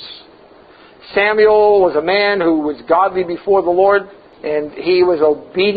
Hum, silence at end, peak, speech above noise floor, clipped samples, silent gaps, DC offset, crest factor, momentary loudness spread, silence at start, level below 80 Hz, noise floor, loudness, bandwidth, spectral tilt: none; 0 s; 0 dBFS; 30 dB; under 0.1%; none; under 0.1%; 14 dB; 10 LU; 0 s; -52 dBFS; -43 dBFS; -14 LUFS; 5 kHz; -9.5 dB/octave